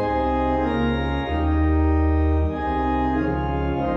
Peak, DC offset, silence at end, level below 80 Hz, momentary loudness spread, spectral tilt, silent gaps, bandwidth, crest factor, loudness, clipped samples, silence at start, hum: -10 dBFS; under 0.1%; 0 s; -26 dBFS; 4 LU; -9.5 dB/octave; none; 5.6 kHz; 10 dB; -22 LUFS; under 0.1%; 0 s; none